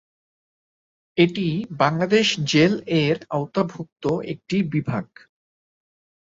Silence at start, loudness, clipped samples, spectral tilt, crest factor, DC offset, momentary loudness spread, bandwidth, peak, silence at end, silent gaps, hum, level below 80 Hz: 1.15 s; -22 LUFS; under 0.1%; -5.5 dB/octave; 20 dB; under 0.1%; 10 LU; 7.8 kHz; -2 dBFS; 1.35 s; 3.92-3.96 s; none; -58 dBFS